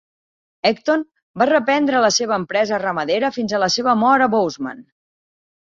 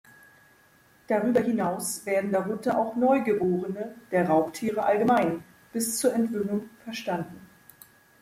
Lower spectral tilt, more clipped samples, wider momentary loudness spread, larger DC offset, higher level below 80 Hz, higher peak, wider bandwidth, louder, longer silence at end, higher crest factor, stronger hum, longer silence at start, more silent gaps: second, -3.5 dB/octave vs -5 dB/octave; neither; second, 7 LU vs 11 LU; neither; first, -62 dBFS vs -68 dBFS; first, -2 dBFS vs -10 dBFS; second, 7.6 kHz vs 16 kHz; first, -18 LUFS vs -26 LUFS; about the same, 0.8 s vs 0.75 s; about the same, 16 dB vs 16 dB; neither; second, 0.65 s vs 1.1 s; first, 1.22-1.34 s vs none